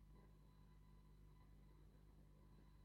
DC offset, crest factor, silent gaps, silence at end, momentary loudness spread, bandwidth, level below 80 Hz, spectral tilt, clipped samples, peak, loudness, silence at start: under 0.1%; 10 dB; none; 0 s; 1 LU; 6 kHz; -68 dBFS; -7 dB/octave; under 0.1%; -58 dBFS; -70 LUFS; 0 s